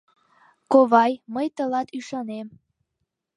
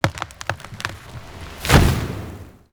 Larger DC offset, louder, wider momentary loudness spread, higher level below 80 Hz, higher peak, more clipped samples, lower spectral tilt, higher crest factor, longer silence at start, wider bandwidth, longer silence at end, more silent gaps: neither; about the same, -22 LUFS vs -21 LUFS; second, 17 LU vs 22 LU; second, -74 dBFS vs -28 dBFS; about the same, -2 dBFS vs 0 dBFS; neither; about the same, -5.5 dB/octave vs -5 dB/octave; about the same, 22 dB vs 22 dB; first, 0.7 s vs 0.05 s; second, 10.5 kHz vs over 20 kHz; first, 0.9 s vs 0.25 s; neither